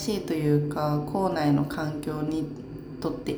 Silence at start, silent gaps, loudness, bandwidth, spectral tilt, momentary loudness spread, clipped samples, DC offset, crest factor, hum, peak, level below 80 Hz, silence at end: 0 s; none; -27 LUFS; over 20 kHz; -7 dB/octave; 10 LU; under 0.1%; under 0.1%; 16 dB; none; -10 dBFS; -52 dBFS; 0 s